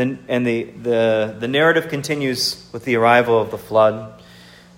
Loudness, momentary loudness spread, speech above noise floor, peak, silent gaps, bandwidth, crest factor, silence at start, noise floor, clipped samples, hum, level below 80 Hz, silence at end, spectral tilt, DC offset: -18 LUFS; 9 LU; 26 dB; 0 dBFS; none; 16.5 kHz; 18 dB; 0 s; -44 dBFS; under 0.1%; none; -58 dBFS; 0.6 s; -5 dB/octave; under 0.1%